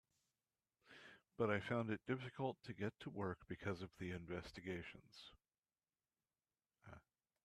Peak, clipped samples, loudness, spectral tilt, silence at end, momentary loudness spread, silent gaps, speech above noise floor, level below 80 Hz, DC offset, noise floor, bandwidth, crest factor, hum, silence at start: -26 dBFS; under 0.1%; -47 LUFS; -7 dB/octave; 0.45 s; 21 LU; 5.59-5.63 s; over 44 dB; -76 dBFS; under 0.1%; under -90 dBFS; 13.5 kHz; 22 dB; none; 0.85 s